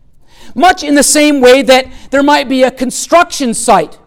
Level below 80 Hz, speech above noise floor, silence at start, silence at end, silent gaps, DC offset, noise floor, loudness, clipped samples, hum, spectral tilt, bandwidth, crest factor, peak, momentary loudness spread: -38 dBFS; 26 dB; 0.4 s; 0.1 s; none; under 0.1%; -34 dBFS; -9 LUFS; under 0.1%; none; -2.5 dB/octave; 18 kHz; 10 dB; 0 dBFS; 7 LU